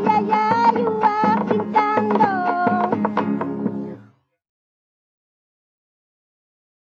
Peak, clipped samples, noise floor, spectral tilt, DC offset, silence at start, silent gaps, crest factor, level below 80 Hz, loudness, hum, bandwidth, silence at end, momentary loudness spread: -4 dBFS; under 0.1%; -50 dBFS; -8 dB/octave; under 0.1%; 0 s; none; 18 dB; -72 dBFS; -19 LUFS; none; 7.2 kHz; 2.95 s; 8 LU